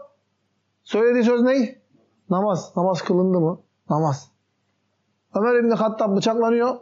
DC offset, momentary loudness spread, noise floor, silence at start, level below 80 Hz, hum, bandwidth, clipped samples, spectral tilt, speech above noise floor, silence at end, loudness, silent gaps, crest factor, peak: under 0.1%; 8 LU; -71 dBFS; 0 s; -76 dBFS; none; 7.6 kHz; under 0.1%; -6 dB/octave; 51 dB; 0 s; -21 LUFS; none; 12 dB; -8 dBFS